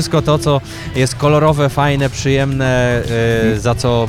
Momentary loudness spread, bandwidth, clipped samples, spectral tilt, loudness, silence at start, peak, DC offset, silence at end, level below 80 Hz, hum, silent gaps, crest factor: 5 LU; 15.5 kHz; under 0.1%; -6 dB/octave; -15 LUFS; 0 s; -2 dBFS; under 0.1%; 0 s; -32 dBFS; none; none; 12 dB